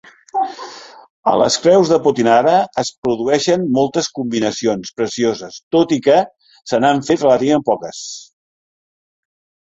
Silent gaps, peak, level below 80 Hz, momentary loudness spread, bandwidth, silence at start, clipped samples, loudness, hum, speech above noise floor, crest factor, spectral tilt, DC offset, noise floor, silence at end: 1.10-1.23 s, 2.98-3.02 s, 5.63-5.71 s; 0 dBFS; -56 dBFS; 15 LU; 8.2 kHz; 0.35 s; under 0.1%; -16 LUFS; none; 20 dB; 16 dB; -4.5 dB/octave; under 0.1%; -35 dBFS; 1.5 s